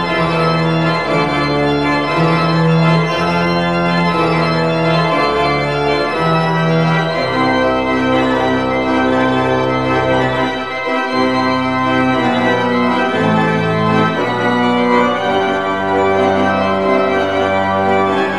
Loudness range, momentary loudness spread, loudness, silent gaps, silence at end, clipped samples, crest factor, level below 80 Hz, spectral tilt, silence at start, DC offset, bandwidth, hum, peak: 1 LU; 2 LU; -14 LUFS; none; 0 s; under 0.1%; 14 dB; -42 dBFS; -6.5 dB/octave; 0 s; 0.9%; 11 kHz; none; 0 dBFS